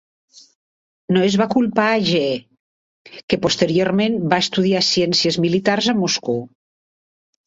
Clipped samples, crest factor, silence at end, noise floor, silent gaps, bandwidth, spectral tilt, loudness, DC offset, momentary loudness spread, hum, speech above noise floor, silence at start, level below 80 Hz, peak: under 0.1%; 18 dB; 1 s; under -90 dBFS; 2.60-3.05 s, 3.23-3.28 s; 8 kHz; -4.5 dB/octave; -18 LUFS; under 0.1%; 7 LU; none; over 72 dB; 1.1 s; -56 dBFS; -2 dBFS